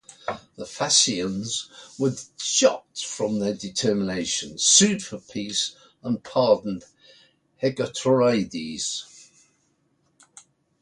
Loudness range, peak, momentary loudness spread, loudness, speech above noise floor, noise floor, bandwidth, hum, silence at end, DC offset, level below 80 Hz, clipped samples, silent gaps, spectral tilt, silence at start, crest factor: 5 LU; -4 dBFS; 16 LU; -23 LUFS; 44 dB; -68 dBFS; 11.5 kHz; none; 1.8 s; under 0.1%; -62 dBFS; under 0.1%; none; -3 dB/octave; 0.25 s; 22 dB